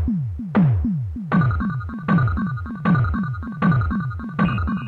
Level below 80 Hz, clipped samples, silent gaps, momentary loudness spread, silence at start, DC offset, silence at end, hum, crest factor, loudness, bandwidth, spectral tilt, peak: -32 dBFS; under 0.1%; none; 7 LU; 0 s; under 0.1%; 0 s; none; 12 dB; -21 LUFS; 4.5 kHz; -10.5 dB/octave; -8 dBFS